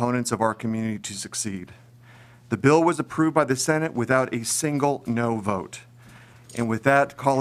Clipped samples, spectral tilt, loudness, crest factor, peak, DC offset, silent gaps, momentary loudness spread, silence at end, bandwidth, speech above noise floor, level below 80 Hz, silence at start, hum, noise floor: under 0.1%; -5 dB/octave; -23 LUFS; 20 dB; -4 dBFS; under 0.1%; none; 11 LU; 0 s; 15.5 kHz; 26 dB; -64 dBFS; 0 s; none; -49 dBFS